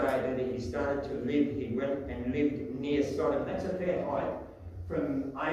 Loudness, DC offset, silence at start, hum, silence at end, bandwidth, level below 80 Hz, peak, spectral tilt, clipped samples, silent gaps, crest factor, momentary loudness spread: -32 LUFS; under 0.1%; 0 s; none; 0 s; 12.5 kHz; -52 dBFS; -16 dBFS; -7.5 dB/octave; under 0.1%; none; 16 dB; 6 LU